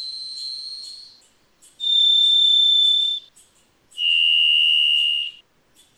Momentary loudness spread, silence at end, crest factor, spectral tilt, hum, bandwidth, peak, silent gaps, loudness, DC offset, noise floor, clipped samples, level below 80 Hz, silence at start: 17 LU; 0.65 s; 10 dB; 4 dB/octave; none; 12.5 kHz; -10 dBFS; none; -15 LUFS; under 0.1%; -58 dBFS; under 0.1%; -74 dBFS; 0 s